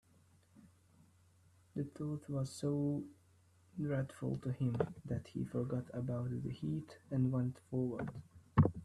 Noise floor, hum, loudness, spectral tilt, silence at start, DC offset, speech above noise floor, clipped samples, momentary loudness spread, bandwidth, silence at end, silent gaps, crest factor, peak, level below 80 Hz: -69 dBFS; none; -40 LUFS; -8.5 dB/octave; 0.65 s; under 0.1%; 30 dB; under 0.1%; 9 LU; 12 kHz; 0 s; none; 24 dB; -16 dBFS; -64 dBFS